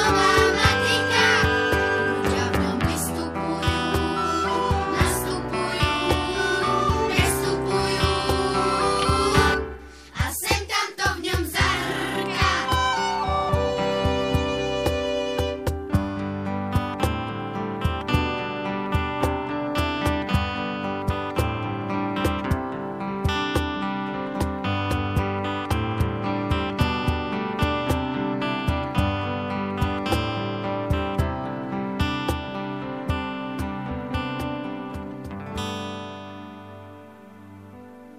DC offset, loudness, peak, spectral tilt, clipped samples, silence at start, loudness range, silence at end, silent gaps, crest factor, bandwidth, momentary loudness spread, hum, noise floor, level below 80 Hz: under 0.1%; -24 LUFS; -6 dBFS; -5 dB/octave; under 0.1%; 0 s; 7 LU; 0 s; none; 20 dB; 15.5 kHz; 10 LU; none; -45 dBFS; -38 dBFS